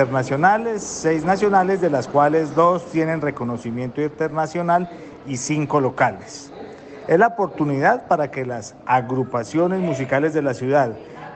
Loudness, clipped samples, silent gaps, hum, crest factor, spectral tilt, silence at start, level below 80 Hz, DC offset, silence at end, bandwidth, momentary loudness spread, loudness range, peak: -20 LUFS; under 0.1%; none; none; 16 dB; -6 dB/octave; 0 s; -56 dBFS; under 0.1%; 0 s; 9 kHz; 13 LU; 4 LU; -4 dBFS